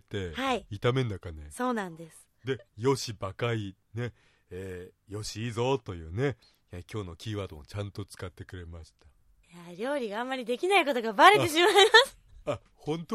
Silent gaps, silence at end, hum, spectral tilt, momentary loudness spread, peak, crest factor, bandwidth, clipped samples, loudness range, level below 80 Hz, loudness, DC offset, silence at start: none; 0 s; none; -4 dB/octave; 23 LU; -4 dBFS; 26 dB; 15 kHz; under 0.1%; 15 LU; -58 dBFS; -27 LUFS; under 0.1%; 0.1 s